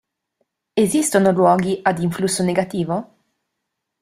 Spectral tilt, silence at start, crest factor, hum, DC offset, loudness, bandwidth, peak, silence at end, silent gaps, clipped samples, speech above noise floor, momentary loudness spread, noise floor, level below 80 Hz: -5 dB/octave; 0.75 s; 18 dB; none; under 0.1%; -18 LUFS; 15.5 kHz; -2 dBFS; 1 s; none; under 0.1%; 60 dB; 9 LU; -78 dBFS; -58 dBFS